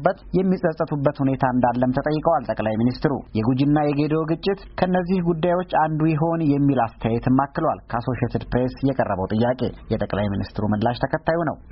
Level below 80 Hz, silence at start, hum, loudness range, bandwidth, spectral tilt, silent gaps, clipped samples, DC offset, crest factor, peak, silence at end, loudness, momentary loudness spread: -42 dBFS; 0 s; none; 2 LU; 5.8 kHz; -7 dB/octave; none; under 0.1%; under 0.1%; 18 dB; -4 dBFS; 0 s; -22 LUFS; 5 LU